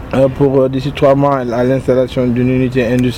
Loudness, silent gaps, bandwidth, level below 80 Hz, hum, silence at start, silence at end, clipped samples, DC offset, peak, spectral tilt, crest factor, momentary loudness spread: -13 LUFS; none; 14 kHz; -34 dBFS; none; 0 s; 0 s; under 0.1%; under 0.1%; 0 dBFS; -8 dB/octave; 12 dB; 3 LU